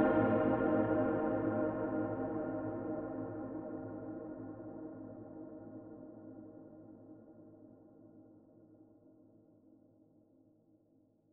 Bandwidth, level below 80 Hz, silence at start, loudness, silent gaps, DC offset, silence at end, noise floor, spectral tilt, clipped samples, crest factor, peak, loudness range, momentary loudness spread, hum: 3.7 kHz; -66 dBFS; 0 s; -37 LUFS; none; under 0.1%; 2.5 s; -71 dBFS; -8.5 dB/octave; under 0.1%; 20 dB; -18 dBFS; 24 LU; 25 LU; none